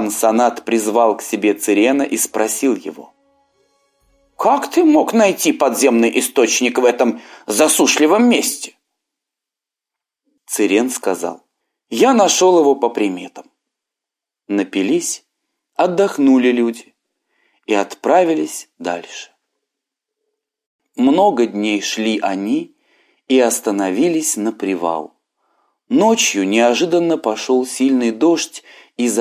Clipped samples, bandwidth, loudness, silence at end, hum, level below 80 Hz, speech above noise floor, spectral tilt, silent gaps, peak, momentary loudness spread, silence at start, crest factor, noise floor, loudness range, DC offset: under 0.1%; 16 kHz; -15 LUFS; 0 s; none; -70 dBFS; 71 dB; -3 dB/octave; 20.66-20.79 s; 0 dBFS; 14 LU; 0 s; 16 dB; -86 dBFS; 6 LU; under 0.1%